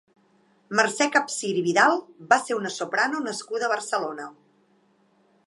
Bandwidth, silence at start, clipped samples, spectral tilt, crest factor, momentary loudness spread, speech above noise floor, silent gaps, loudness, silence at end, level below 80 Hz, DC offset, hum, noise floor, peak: 11.5 kHz; 0.7 s; under 0.1%; -3 dB/octave; 22 dB; 10 LU; 39 dB; none; -24 LUFS; 1.15 s; -80 dBFS; under 0.1%; none; -63 dBFS; -4 dBFS